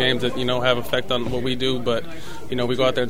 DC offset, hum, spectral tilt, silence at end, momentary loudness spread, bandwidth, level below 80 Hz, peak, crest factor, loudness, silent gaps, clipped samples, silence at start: 5%; none; -5 dB/octave; 0 s; 8 LU; 16 kHz; -46 dBFS; -4 dBFS; 18 dB; -23 LUFS; none; under 0.1%; 0 s